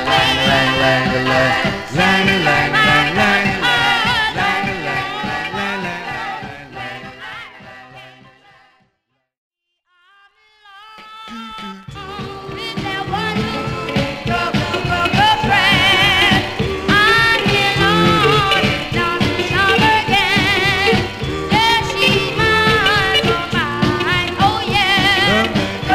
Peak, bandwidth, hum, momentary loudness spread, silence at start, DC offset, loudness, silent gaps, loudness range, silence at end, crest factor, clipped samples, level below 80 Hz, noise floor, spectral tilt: 0 dBFS; 16 kHz; none; 17 LU; 0 s; under 0.1%; -14 LUFS; 9.37-9.51 s; 16 LU; 0 s; 16 dB; under 0.1%; -38 dBFS; -70 dBFS; -4.5 dB/octave